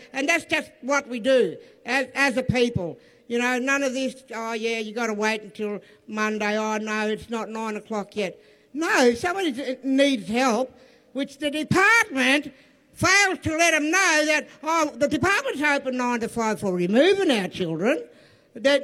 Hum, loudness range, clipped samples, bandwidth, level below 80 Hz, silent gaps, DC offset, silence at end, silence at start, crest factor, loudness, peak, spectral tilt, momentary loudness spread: none; 7 LU; under 0.1%; 15.5 kHz; -56 dBFS; none; under 0.1%; 0 s; 0 s; 18 dB; -23 LUFS; -6 dBFS; -3.5 dB/octave; 12 LU